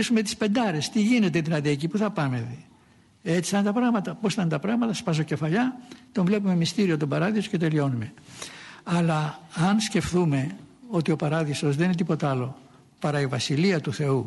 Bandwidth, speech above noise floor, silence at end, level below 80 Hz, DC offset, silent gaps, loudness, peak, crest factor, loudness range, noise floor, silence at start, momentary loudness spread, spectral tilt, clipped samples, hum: 11.5 kHz; 33 dB; 0 s; -58 dBFS; under 0.1%; none; -25 LUFS; -12 dBFS; 14 dB; 1 LU; -57 dBFS; 0 s; 10 LU; -6 dB/octave; under 0.1%; none